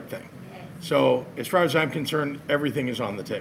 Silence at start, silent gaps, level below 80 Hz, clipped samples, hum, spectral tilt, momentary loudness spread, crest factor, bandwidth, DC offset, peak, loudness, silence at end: 0 s; none; -64 dBFS; under 0.1%; none; -5.5 dB/octave; 17 LU; 20 dB; 16.5 kHz; under 0.1%; -6 dBFS; -25 LUFS; 0 s